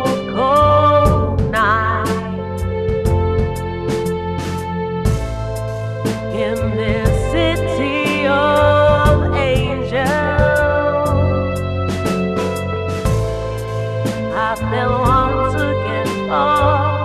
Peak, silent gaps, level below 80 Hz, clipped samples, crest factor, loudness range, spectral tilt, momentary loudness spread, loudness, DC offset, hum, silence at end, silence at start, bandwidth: 0 dBFS; none; -28 dBFS; under 0.1%; 16 dB; 5 LU; -6.5 dB/octave; 10 LU; -17 LUFS; under 0.1%; none; 0 s; 0 s; 14 kHz